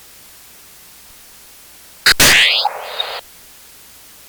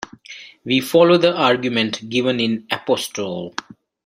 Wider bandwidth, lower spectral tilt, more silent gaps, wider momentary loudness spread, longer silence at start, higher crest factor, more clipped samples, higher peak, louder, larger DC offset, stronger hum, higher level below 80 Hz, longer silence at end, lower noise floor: first, over 20 kHz vs 16 kHz; second, 0 dB/octave vs -4.5 dB/octave; neither; second, 16 LU vs 20 LU; first, 2.05 s vs 0 s; about the same, 18 dB vs 18 dB; neither; about the same, 0 dBFS vs -2 dBFS; first, -12 LUFS vs -18 LUFS; neither; neither; first, -42 dBFS vs -62 dBFS; first, 1.1 s vs 0.45 s; about the same, -42 dBFS vs -40 dBFS